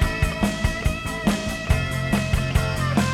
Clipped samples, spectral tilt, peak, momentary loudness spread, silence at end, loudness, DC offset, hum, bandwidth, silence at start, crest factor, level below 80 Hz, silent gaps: under 0.1%; -5.5 dB/octave; -6 dBFS; 2 LU; 0 s; -23 LUFS; under 0.1%; none; 16.5 kHz; 0 s; 16 dB; -28 dBFS; none